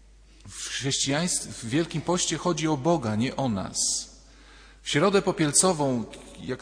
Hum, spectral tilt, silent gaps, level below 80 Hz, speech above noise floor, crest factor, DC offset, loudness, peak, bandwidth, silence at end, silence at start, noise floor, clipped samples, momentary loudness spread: none; -3.5 dB/octave; none; -52 dBFS; 25 dB; 20 dB; under 0.1%; -25 LUFS; -6 dBFS; 11 kHz; 0.05 s; 0.45 s; -50 dBFS; under 0.1%; 15 LU